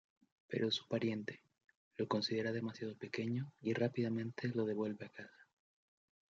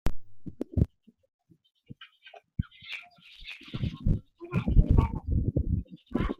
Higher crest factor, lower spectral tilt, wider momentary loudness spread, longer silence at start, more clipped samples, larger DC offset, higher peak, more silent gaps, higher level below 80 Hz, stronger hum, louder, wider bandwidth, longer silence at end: about the same, 20 dB vs 22 dB; second, -5 dB/octave vs -8.5 dB/octave; second, 13 LU vs 22 LU; first, 0.5 s vs 0.05 s; neither; neither; second, -22 dBFS vs -8 dBFS; first, 1.75-1.91 s vs 1.34-1.39 s; second, -86 dBFS vs -34 dBFS; neither; second, -40 LUFS vs -31 LUFS; first, 7.6 kHz vs 6.4 kHz; first, 0.9 s vs 0.05 s